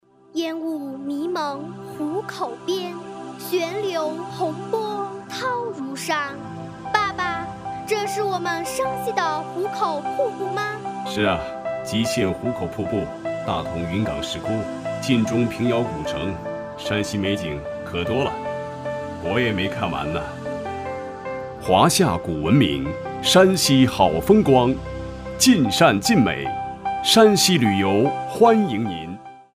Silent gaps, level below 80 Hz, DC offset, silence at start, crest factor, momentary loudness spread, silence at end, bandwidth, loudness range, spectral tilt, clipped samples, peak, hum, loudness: none; -46 dBFS; under 0.1%; 0.35 s; 20 dB; 14 LU; 0.15 s; 15.5 kHz; 9 LU; -4.5 dB/octave; under 0.1%; -2 dBFS; none; -22 LUFS